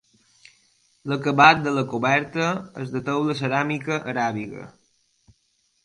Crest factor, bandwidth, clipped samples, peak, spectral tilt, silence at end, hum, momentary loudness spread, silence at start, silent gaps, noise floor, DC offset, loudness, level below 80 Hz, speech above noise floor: 24 dB; 11 kHz; under 0.1%; 0 dBFS; -5.5 dB/octave; 1.15 s; none; 16 LU; 1.05 s; none; -68 dBFS; under 0.1%; -22 LUFS; -60 dBFS; 46 dB